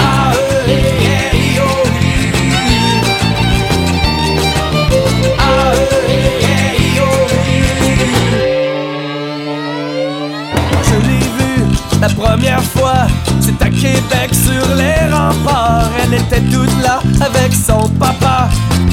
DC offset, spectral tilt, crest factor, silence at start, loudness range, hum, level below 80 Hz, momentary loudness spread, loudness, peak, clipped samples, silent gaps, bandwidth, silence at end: under 0.1%; -5 dB/octave; 12 dB; 0 s; 3 LU; none; -22 dBFS; 3 LU; -12 LUFS; 0 dBFS; under 0.1%; none; 17 kHz; 0 s